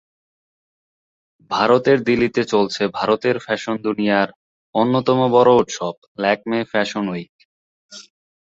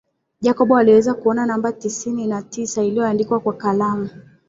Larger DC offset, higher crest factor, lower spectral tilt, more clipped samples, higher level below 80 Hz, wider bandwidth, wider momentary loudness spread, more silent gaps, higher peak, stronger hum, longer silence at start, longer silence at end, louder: neither; about the same, 18 dB vs 16 dB; about the same, -5.5 dB/octave vs -5.5 dB/octave; neither; about the same, -58 dBFS vs -60 dBFS; about the same, 8 kHz vs 7.8 kHz; about the same, 11 LU vs 11 LU; first, 4.36-4.73 s, 5.98-6.15 s, 7.29-7.39 s, 7.45-7.89 s vs none; about the same, -2 dBFS vs -2 dBFS; neither; first, 1.5 s vs 0.4 s; first, 0.45 s vs 0.25 s; about the same, -18 LUFS vs -18 LUFS